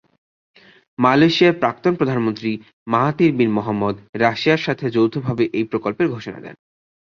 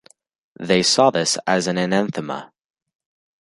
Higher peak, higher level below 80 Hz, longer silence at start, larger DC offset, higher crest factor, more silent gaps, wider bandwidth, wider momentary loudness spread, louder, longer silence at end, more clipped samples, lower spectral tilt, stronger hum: about the same, -2 dBFS vs -2 dBFS; about the same, -56 dBFS vs -60 dBFS; first, 1 s vs 0.6 s; neither; about the same, 18 dB vs 20 dB; first, 2.73-2.86 s, 4.09-4.13 s vs none; second, 7 kHz vs 11.5 kHz; about the same, 13 LU vs 15 LU; about the same, -18 LUFS vs -18 LUFS; second, 0.55 s vs 1 s; neither; first, -7 dB/octave vs -3.5 dB/octave; neither